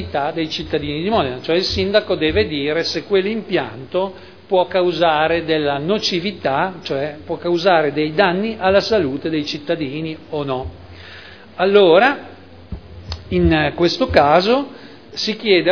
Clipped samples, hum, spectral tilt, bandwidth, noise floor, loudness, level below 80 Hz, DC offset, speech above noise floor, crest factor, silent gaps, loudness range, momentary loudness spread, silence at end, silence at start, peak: under 0.1%; none; -5.5 dB/octave; 5.4 kHz; -39 dBFS; -18 LUFS; -40 dBFS; 0.4%; 22 dB; 18 dB; none; 2 LU; 13 LU; 0 s; 0 s; 0 dBFS